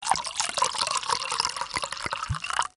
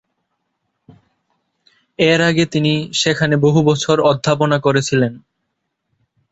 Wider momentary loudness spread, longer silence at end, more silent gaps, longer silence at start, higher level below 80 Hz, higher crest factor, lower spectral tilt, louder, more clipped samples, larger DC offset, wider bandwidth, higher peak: about the same, 5 LU vs 4 LU; second, 0.1 s vs 1.15 s; neither; second, 0 s vs 2 s; about the same, -52 dBFS vs -54 dBFS; first, 22 dB vs 16 dB; second, -1 dB/octave vs -5 dB/octave; second, -27 LUFS vs -15 LUFS; neither; neither; first, 11.5 kHz vs 8.2 kHz; second, -6 dBFS vs -2 dBFS